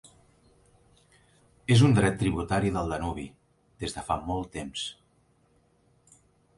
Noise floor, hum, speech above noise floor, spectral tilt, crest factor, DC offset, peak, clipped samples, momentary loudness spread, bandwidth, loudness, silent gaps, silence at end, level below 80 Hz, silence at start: -66 dBFS; none; 40 dB; -6 dB/octave; 22 dB; under 0.1%; -8 dBFS; under 0.1%; 16 LU; 11.5 kHz; -27 LUFS; none; 1.65 s; -48 dBFS; 1.7 s